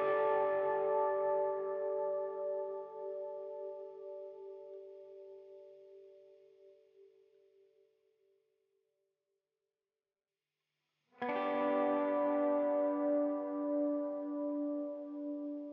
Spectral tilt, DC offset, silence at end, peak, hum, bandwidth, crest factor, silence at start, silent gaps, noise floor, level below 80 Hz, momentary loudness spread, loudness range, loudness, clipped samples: -4 dB/octave; under 0.1%; 0 s; -22 dBFS; none; 4.1 kHz; 16 dB; 0 s; none; under -90 dBFS; under -90 dBFS; 19 LU; 19 LU; -36 LUFS; under 0.1%